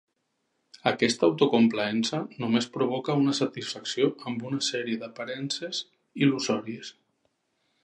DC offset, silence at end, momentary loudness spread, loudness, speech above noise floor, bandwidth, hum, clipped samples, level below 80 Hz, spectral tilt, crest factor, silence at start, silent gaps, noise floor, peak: under 0.1%; 0.9 s; 11 LU; -27 LUFS; 50 dB; 10.5 kHz; none; under 0.1%; -74 dBFS; -4.5 dB/octave; 22 dB; 0.75 s; none; -77 dBFS; -6 dBFS